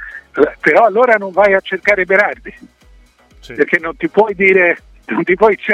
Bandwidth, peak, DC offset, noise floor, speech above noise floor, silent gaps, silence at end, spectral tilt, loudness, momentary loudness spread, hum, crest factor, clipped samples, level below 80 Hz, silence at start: 9.6 kHz; 0 dBFS; under 0.1%; -46 dBFS; 33 dB; none; 0 s; -6.5 dB/octave; -13 LUFS; 11 LU; none; 14 dB; under 0.1%; -46 dBFS; 0 s